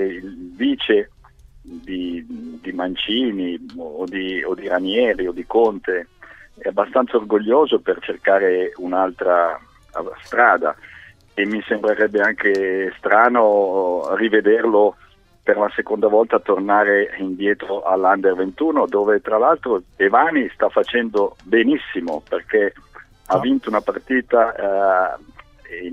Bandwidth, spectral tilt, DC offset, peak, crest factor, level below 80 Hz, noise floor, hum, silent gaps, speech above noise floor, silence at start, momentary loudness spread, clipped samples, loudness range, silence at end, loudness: 7.8 kHz; -6 dB/octave; under 0.1%; 0 dBFS; 18 dB; -54 dBFS; -47 dBFS; none; none; 29 dB; 0 s; 13 LU; under 0.1%; 5 LU; 0 s; -18 LUFS